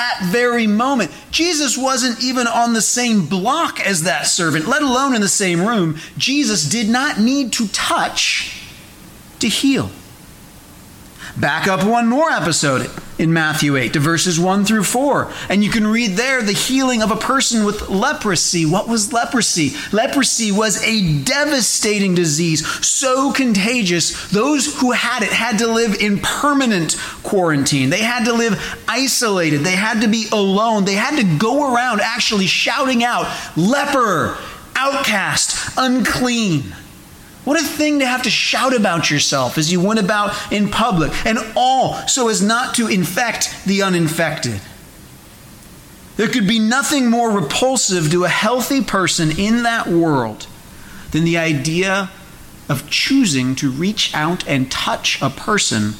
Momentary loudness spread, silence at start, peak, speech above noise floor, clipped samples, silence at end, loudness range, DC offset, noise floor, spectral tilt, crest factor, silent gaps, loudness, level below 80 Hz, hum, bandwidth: 5 LU; 0 s; -6 dBFS; 24 dB; under 0.1%; 0 s; 3 LU; under 0.1%; -40 dBFS; -3.5 dB/octave; 12 dB; none; -16 LUFS; -44 dBFS; none; 17 kHz